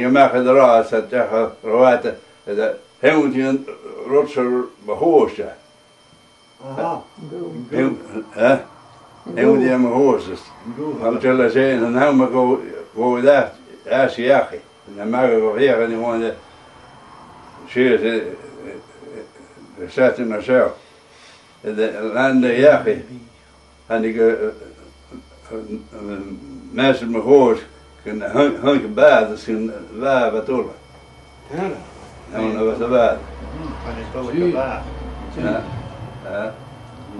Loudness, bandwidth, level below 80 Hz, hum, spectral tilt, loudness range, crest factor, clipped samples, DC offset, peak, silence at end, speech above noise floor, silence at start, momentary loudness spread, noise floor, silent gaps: -17 LUFS; 11 kHz; -46 dBFS; none; -6.5 dB/octave; 7 LU; 18 dB; under 0.1%; under 0.1%; 0 dBFS; 0 s; 33 dB; 0 s; 20 LU; -50 dBFS; none